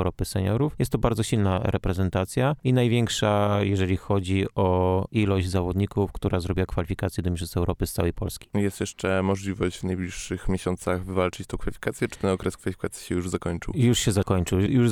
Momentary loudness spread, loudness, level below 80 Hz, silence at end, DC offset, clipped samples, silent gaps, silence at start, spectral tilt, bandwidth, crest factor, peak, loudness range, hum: 7 LU; -26 LUFS; -40 dBFS; 0 s; under 0.1%; under 0.1%; none; 0 s; -6 dB/octave; 15.5 kHz; 20 dB; -4 dBFS; 5 LU; none